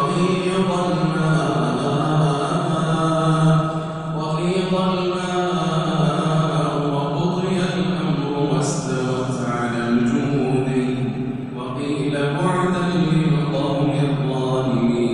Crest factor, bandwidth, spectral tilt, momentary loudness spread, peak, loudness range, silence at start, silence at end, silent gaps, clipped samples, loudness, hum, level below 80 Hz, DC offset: 14 dB; 10.5 kHz; -6.5 dB/octave; 4 LU; -6 dBFS; 2 LU; 0 s; 0 s; none; under 0.1%; -20 LUFS; none; -48 dBFS; under 0.1%